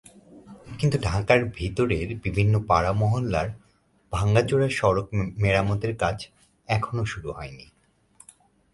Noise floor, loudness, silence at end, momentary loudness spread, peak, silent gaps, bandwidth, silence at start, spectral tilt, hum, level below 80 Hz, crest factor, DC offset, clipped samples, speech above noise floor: -62 dBFS; -24 LUFS; 1.1 s; 13 LU; -4 dBFS; none; 11.5 kHz; 0.3 s; -6.5 dB/octave; none; -42 dBFS; 20 dB; under 0.1%; under 0.1%; 39 dB